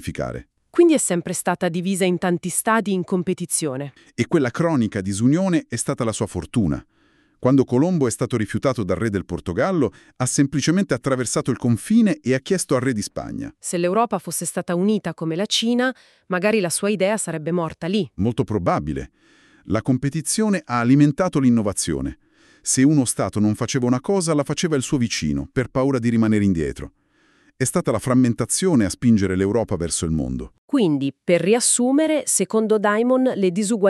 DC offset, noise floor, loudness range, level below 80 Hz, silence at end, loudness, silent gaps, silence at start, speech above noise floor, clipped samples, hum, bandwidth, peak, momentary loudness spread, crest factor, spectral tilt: under 0.1%; -60 dBFS; 3 LU; -46 dBFS; 0 s; -20 LUFS; 30.58-30.68 s; 0 s; 40 dB; under 0.1%; none; 13.5 kHz; -4 dBFS; 8 LU; 16 dB; -5 dB/octave